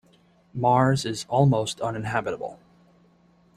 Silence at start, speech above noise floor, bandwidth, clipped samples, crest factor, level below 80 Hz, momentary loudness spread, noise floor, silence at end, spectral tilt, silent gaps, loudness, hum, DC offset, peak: 0.55 s; 36 dB; 13 kHz; under 0.1%; 20 dB; -58 dBFS; 14 LU; -59 dBFS; 1 s; -6 dB/octave; none; -24 LUFS; none; under 0.1%; -6 dBFS